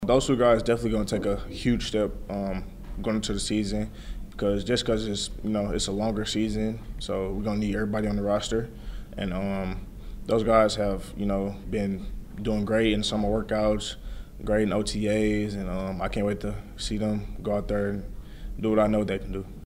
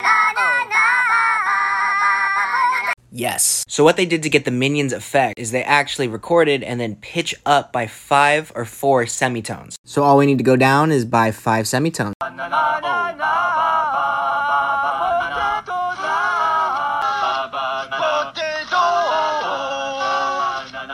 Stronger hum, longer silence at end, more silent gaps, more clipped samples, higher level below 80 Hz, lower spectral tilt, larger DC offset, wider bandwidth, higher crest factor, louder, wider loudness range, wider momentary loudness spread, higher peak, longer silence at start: neither; about the same, 0 s vs 0 s; second, none vs 9.78-9.84 s, 12.15-12.20 s; neither; first, -38 dBFS vs -56 dBFS; first, -5.5 dB/octave vs -4 dB/octave; neither; about the same, 15.5 kHz vs 16.5 kHz; about the same, 20 dB vs 18 dB; second, -27 LUFS vs -18 LUFS; about the same, 3 LU vs 4 LU; first, 13 LU vs 9 LU; second, -6 dBFS vs 0 dBFS; about the same, 0 s vs 0 s